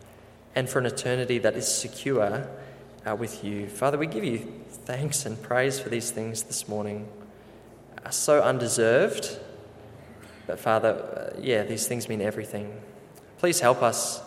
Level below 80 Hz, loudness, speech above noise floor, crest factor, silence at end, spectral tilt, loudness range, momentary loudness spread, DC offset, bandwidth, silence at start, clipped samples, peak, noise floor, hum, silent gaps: -64 dBFS; -27 LUFS; 24 dB; 22 dB; 0 s; -4 dB/octave; 4 LU; 22 LU; under 0.1%; 16.5 kHz; 0 s; under 0.1%; -6 dBFS; -50 dBFS; none; none